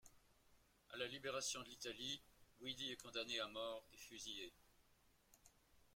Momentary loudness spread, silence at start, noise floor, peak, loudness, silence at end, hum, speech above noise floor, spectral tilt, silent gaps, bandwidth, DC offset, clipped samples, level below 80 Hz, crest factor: 9 LU; 0.05 s; -76 dBFS; -30 dBFS; -49 LUFS; 0.15 s; none; 26 dB; -1.5 dB/octave; none; 16.5 kHz; under 0.1%; under 0.1%; -78 dBFS; 22 dB